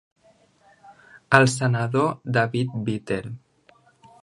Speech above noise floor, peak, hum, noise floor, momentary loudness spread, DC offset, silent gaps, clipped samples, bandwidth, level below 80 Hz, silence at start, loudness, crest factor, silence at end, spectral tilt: 37 dB; 0 dBFS; none; -59 dBFS; 12 LU; under 0.1%; none; under 0.1%; 11.5 kHz; -60 dBFS; 0.9 s; -22 LUFS; 24 dB; 0.85 s; -5.5 dB/octave